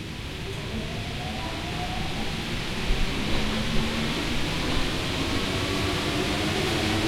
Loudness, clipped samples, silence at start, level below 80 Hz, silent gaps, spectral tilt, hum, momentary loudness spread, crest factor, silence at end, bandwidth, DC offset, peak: -28 LUFS; under 0.1%; 0 s; -34 dBFS; none; -4.5 dB/octave; none; 7 LU; 18 dB; 0 s; 16.5 kHz; under 0.1%; -10 dBFS